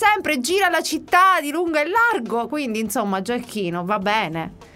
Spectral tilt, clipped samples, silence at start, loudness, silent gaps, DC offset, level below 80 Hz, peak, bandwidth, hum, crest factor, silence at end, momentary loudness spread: -3.5 dB/octave; under 0.1%; 0 s; -20 LUFS; none; under 0.1%; -56 dBFS; -2 dBFS; 16 kHz; none; 18 dB; 0.1 s; 9 LU